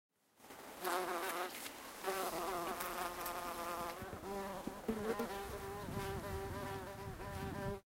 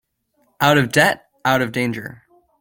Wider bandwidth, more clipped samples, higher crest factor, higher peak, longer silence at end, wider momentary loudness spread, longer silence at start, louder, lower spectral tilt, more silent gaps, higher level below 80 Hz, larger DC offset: about the same, 16 kHz vs 17 kHz; neither; about the same, 20 dB vs 18 dB; second, -24 dBFS vs -2 dBFS; second, 0.2 s vs 0.45 s; second, 7 LU vs 12 LU; second, 0.4 s vs 0.6 s; second, -43 LUFS vs -18 LUFS; about the same, -4 dB/octave vs -4.5 dB/octave; neither; about the same, -60 dBFS vs -56 dBFS; neither